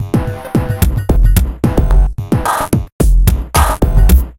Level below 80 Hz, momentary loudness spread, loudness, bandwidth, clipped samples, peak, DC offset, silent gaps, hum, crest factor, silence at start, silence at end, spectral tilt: -12 dBFS; 5 LU; -14 LUFS; 17 kHz; 0.2%; 0 dBFS; under 0.1%; 2.92-2.99 s; none; 10 dB; 0 s; 0.05 s; -6 dB/octave